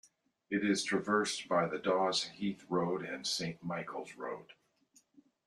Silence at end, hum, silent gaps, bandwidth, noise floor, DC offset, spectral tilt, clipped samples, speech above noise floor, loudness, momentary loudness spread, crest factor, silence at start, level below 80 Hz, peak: 0.95 s; none; none; 12.5 kHz; -70 dBFS; under 0.1%; -4 dB/octave; under 0.1%; 35 dB; -35 LUFS; 11 LU; 20 dB; 0.5 s; -76 dBFS; -16 dBFS